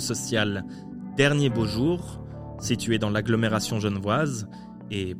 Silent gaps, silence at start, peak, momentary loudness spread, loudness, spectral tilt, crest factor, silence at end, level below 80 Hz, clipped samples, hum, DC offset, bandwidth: none; 0 s; -6 dBFS; 16 LU; -25 LUFS; -5 dB/octave; 20 dB; 0 s; -48 dBFS; under 0.1%; none; under 0.1%; 16 kHz